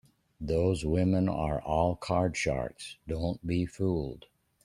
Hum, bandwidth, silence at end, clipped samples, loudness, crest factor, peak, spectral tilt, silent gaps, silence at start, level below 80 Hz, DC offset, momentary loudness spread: none; 11.5 kHz; 0.45 s; under 0.1%; -30 LUFS; 18 dB; -12 dBFS; -6.5 dB/octave; none; 0.4 s; -46 dBFS; under 0.1%; 11 LU